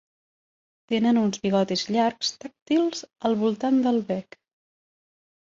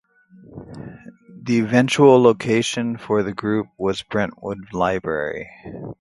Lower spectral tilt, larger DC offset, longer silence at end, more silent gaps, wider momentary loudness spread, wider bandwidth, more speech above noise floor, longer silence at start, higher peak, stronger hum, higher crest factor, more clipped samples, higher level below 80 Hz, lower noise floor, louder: about the same, -5 dB/octave vs -5.5 dB/octave; neither; first, 1.2 s vs 0.1 s; first, 2.62-2.66 s vs none; second, 7 LU vs 23 LU; second, 7.8 kHz vs 11.5 kHz; first, over 66 dB vs 29 dB; first, 0.9 s vs 0.5 s; second, -10 dBFS vs 0 dBFS; neither; about the same, 16 dB vs 20 dB; neither; second, -68 dBFS vs -52 dBFS; first, under -90 dBFS vs -48 dBFS; second, -24 LUFS vs -19 LUFS